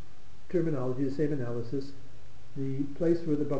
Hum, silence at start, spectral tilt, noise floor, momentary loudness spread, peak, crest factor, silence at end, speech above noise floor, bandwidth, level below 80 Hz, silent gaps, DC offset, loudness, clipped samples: none; 0 s; -9 dB/octave; -54 dBFS; 9 LU; -14 dBFS; 16 dB; 0 s; 23 dB; 8.4 kHz; -58 dBFS; none; 3%; -32 LUFS; under 0.1%